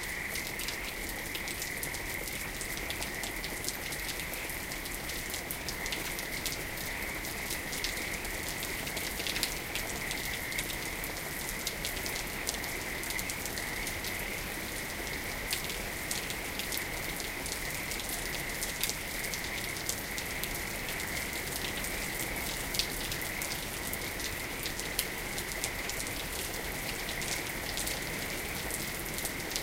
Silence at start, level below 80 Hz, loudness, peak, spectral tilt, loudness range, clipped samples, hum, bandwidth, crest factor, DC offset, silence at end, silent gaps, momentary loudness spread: 0 s; -48 dBFS; -34 LUFS; -6 dBFS; -2 dB/octave; 1 LU; under 0.1%; none; 16.5 kHz; 30 dB; under 0.1%; 0 s; none; 3 LU